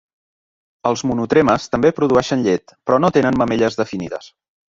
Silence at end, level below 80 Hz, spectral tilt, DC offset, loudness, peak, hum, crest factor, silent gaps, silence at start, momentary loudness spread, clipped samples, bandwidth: 0.5 s; -48 dBFS; -6 dB/octave; under 0.1%; -17 LUFS; -2 dBFS; none; 16 dB; none; 0.85 s; 9 LU; under 0.1%; 7.6 kHz